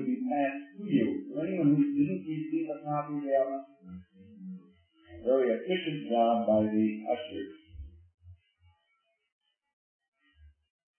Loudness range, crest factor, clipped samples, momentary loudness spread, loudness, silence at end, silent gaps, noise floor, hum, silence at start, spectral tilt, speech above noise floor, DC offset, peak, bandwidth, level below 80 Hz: 6 LU; 18 dB; under 0.1%; 22 LU; -30 LUFS; 0.5 s; 8.14-8.18 s, 9.32-9.39 s, 9.73-10.00 s, 10.08-10.12 s; -76 dBFS; none; 0 s; -10.5 dB/octave; 47 dB; under 0.1%; -14 dBFS; 3.3 kHz; -62 dBFS